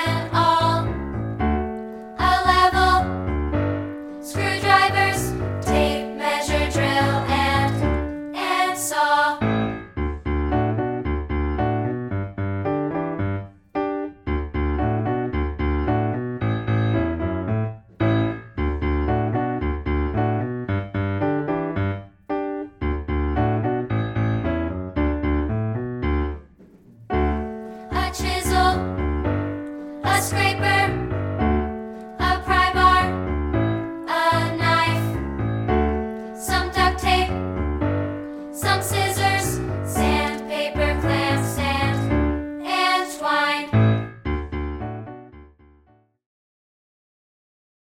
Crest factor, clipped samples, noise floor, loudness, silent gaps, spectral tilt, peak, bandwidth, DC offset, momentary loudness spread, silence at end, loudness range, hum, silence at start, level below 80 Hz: 20 dB; under 0.1%; -58 dBFS; -22 LUFS; none; -5.5 dB/octave; -4 dBFS; 17 kHz; under 0.1%; 10 LU; 2.45 s; 5 LU; none; 0 s; -32 dBFS